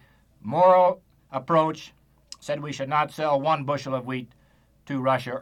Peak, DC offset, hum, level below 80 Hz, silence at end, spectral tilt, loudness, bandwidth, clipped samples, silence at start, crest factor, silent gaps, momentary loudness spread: -8 dBFS; under 0.1%; none; -64 dBFS; 0 s; -6 dB/octave; -24 LUFS; 12 kHz; under 0.1%; 0.45 s; 18 dB; none; 19 LU